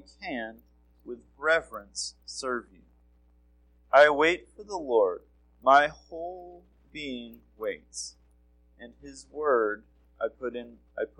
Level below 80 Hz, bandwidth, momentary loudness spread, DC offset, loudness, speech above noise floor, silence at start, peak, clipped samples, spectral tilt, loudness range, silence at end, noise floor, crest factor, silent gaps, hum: -60 dBFS; 16.5 kHz; 23 LU; under 0.1%; -27 LUFS; 33 dB; 0.2 s; -6 dBFS; under 0.1%; -2.5 dB/octave; 10 LU; 0.15 s; -62 dBFS; 24 dB; none; none